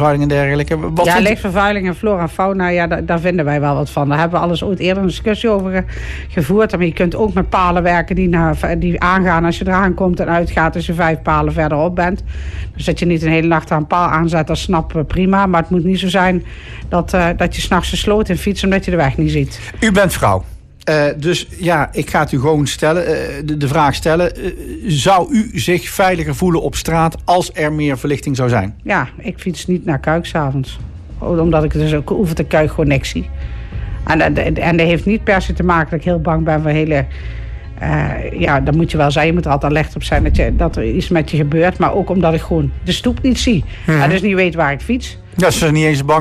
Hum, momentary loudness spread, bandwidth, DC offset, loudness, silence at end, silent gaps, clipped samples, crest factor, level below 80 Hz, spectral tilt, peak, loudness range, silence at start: none; 7 LU; 14.5 kHz; under 0.1%; -15 LUFS; 0 s; none; under 0.1%; 12 dB; -26 dBFS; -6 dB/octave; -2 dBFS; 2 LU; 0 s